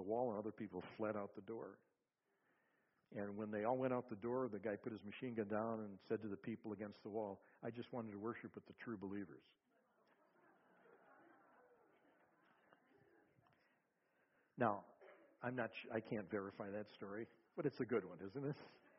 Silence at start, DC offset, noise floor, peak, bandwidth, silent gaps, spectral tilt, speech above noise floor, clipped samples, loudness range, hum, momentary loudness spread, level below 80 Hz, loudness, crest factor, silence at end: 0 s; under 0.1%; -86 dBFS; -24 dBFS; 5.6 kHz; none; -6 dB/octave; 40 dB; under 0.1%; 8 LU; none; 11 LU; -86 dBFS; -47 LUFS; 24 dB; 0.1 s